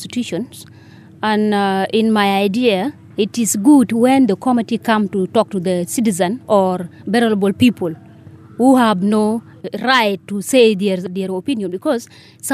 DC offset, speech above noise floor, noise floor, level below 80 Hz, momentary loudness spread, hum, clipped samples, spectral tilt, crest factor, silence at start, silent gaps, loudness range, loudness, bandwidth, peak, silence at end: under 0.1%; 24 dB; -40 dBFS; -66 dBFS; 11 LU; none; under 0.1%; -5 dB/octave; 14 dB; 0 s; none; 3 LU; -16 LUFS; 15.5 kHz; -2 dBFS; 0 s